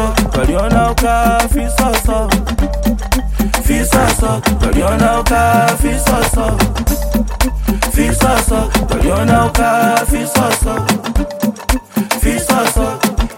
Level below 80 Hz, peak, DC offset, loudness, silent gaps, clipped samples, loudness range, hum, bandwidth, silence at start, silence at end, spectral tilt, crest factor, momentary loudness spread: -18 dBFS; 0 dBFS; under 0.1%; -14 LUFS; none; under 0.1%; 2 LU; none; 17 kHz; 0 s; 0 s; -4.5 dB/octave; 12 dB; 6 LU